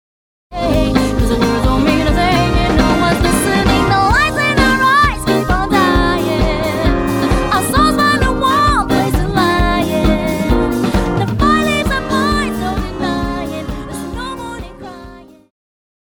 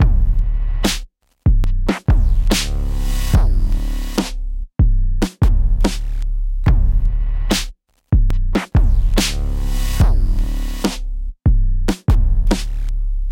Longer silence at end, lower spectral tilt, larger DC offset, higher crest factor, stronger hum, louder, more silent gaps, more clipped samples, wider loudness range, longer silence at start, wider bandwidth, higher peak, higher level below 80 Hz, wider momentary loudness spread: first, 0.85 s vs 0 s; about the same, -5.5 dB/octave vs -5.5 dB/octave; neither; about the same, 14 dB vs 14 dB; neither; first, -14 LUFS vs -20 LUFS; neither; neither; first, 6 LU vs 1 LU; first, 0.5 s vs 0 s; first, over 20 kHz vs 16.5 kHz; about the same, 0 dBFS vs 0 dBFS; second, -22 dBFS vs -16 dBFS; first, 12 LU vs 8 LU